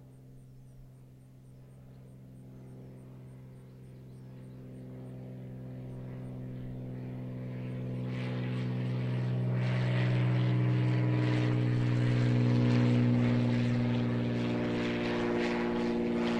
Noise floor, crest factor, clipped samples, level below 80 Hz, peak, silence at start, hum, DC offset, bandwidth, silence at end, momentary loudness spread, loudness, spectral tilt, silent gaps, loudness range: -54 dBFS; 14 dB; under 0.1%; -56 dBFS; -16 dBFS; 0 s; none; under 0.1%; 8 kHz; 0 s; 22 LU; -31 LUFS; -8.5 dB/octave; none; 22 LU